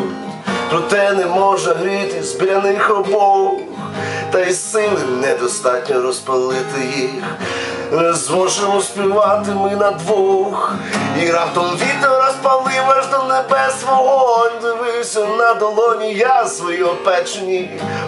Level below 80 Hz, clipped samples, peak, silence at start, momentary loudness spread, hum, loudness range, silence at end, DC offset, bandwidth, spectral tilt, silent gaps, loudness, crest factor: -70 dBFS; under 0.1%; 0 dBFS; 0 s; 7 LU; none; 3 LU; 0 s; under 0.1%; 11.5 kHz; -3.5 dB/octave; none; -16 LUFS; 16 dB